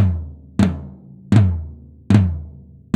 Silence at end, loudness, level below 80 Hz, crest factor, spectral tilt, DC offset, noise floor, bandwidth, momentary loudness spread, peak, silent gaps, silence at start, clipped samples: 0.45 s; -19 LUFS; -34 dBFS; 18 dB; -8.5 dB/octave; under 0.1%; -40 dBFS; 9.2 kHz; 20 LU; 0 dBFS; none; 0 s; under 0.1%